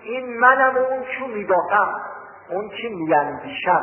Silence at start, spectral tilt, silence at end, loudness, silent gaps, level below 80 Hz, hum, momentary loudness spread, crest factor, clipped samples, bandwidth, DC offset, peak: 0 s; -8 dB/octave; 0 s; -20 LUFS; none; -62 dBFS; none; 14 LU; 18 dB; under 0.1%; 3.3 kHz; under 0.1%; -2 dBFS